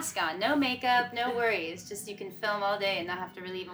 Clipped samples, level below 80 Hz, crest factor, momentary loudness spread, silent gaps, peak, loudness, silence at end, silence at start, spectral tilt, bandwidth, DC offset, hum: under 0.1%; -72 dBFS; 18 dB; 12 LU; none; -14 dBFS; -30 LUFS; 0 s; 0 s; -3 dB/octave; over 20 kHz; under 0.1%; none